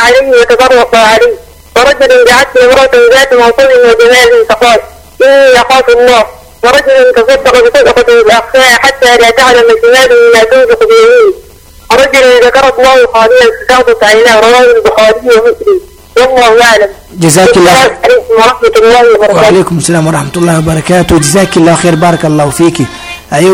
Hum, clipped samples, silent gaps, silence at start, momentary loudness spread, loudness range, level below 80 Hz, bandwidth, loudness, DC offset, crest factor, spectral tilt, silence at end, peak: none; 5%; none; 0 s; 6 LU; 2 LU; -32 dBFS; 16.5 kHz; -4 LUFS; under 0.1%; 4 dB; -4 dB/octave; 0 s; 0 dBFS